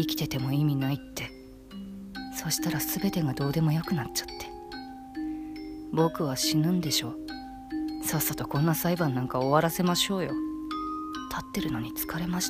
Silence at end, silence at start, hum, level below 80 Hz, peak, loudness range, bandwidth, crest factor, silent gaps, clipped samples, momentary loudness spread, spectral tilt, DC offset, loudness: 0 s; 0 s; none; -52 dBFS; -8 dBFS; 3 LU; 15.5 kHz; 22 dB; none; under 0.1%; 15 LU; -4.5 dB/octave; under 0.1%; -29 LUFS